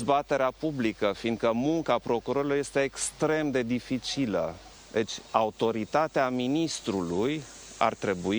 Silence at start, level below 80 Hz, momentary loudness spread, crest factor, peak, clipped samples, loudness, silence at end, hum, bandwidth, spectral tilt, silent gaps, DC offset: 0 s; -58 dBFS; 5 LU; 20 dB; -8 dBFS; under 0.1%; -28 LUFS; 0 s; none; over 20 kHz; -4.5 dB/octave; none; under 0.1%